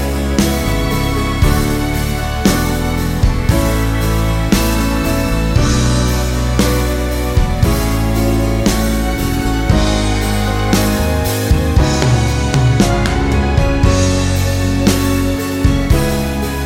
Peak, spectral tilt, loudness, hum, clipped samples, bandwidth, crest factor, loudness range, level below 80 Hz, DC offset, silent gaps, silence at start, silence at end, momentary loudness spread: 0 dBFS; -5.5 dB/octave; -15 LUFS; none; under 0.1%; 17 kHz; 14 dB; 2 LU; -18 dBFS; under 0.1%; none; 0 s; 0 s; 4 LU